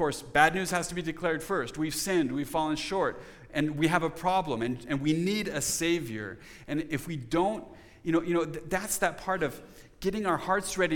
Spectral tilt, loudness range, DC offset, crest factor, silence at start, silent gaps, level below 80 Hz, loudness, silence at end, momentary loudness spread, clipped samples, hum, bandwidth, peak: -4 dB/octave; 2 LU; under 0.1%; 22 dB; 0 s; none; -54 dBFS; -29 LUFS; 0 s; 8 LU; under 0.1%; none; 19 kHz; -8 dBFS